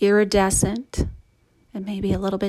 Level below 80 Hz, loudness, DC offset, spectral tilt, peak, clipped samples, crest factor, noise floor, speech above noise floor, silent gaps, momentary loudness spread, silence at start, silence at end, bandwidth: -36 dBFS; -22 LUFS; under 0.1%; -4.5 dB/octave; -6 dBFS; under 0.1%; 16 dB; -60 dBFS; 39 dB; none; 14 LU; 0 s; 0 s; 15 kHz